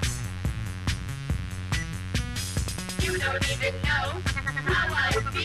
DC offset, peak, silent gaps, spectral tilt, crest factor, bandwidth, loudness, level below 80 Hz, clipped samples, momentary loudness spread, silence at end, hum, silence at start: under 0.1%; -12 dBFS; none; -4 dB/octave; 16 dB; 14 kHz; -28 LUFS; -36 dBFS; under 0.1%; 7 LU; 0 s; none; 0 s